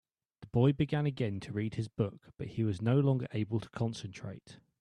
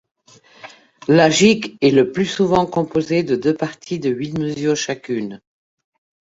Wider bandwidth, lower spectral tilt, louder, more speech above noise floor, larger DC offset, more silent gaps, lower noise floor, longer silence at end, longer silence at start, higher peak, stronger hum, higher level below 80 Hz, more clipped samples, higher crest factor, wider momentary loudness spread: first, 10 kHz vs 8 kHz; first, -8 dB/octave vs -5 dB/octave; second, -33 LUFS vs -18 LUFS; second, 24 dB vs 31 dB; neither; neither; first, -57 dBFS vs -48 dBFS; second, 0.25 s vs 0.85 s; second, 0.4 s vs 0.65 s; second, -16 dBFS vs -2 dBFS; neither; second, -62 dBFS vs -56 dBFS; neither; about the same, 18 dB vs 18 dB; first, 15 LU vs 11 LU